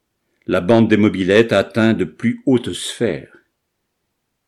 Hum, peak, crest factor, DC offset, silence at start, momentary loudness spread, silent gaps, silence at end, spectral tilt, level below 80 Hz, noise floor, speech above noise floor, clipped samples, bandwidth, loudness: none; -2 dBFS; 16 dB; under 0.1%; 0.5 s; 9 LU; none; 1.25 s; -6 dB/octave; -54 dBFS; -73 dBFS; 57 dB; under 0.1%; 12.5 kHz; -16 LUFS